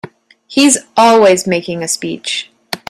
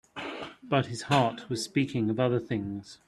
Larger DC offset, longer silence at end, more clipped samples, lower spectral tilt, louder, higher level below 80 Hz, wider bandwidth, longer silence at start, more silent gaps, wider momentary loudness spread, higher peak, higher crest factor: neither; about the same, 0.15 s vs 0.1 s; neither; second, -3 dB/octave vs -5.5 dB/octave; first, -12 LUFS vs -29 LUFS; first, -56 dBFS vs -64 dBFS; first, 15 kHz vs 12.5 kHz; about the same, 0.05 s vs 0.15 s; neither; about the same, 12 LU vs 12 LU; first, 0 dBFS vs -8 dBFS; second, 14 dB vs 20 dB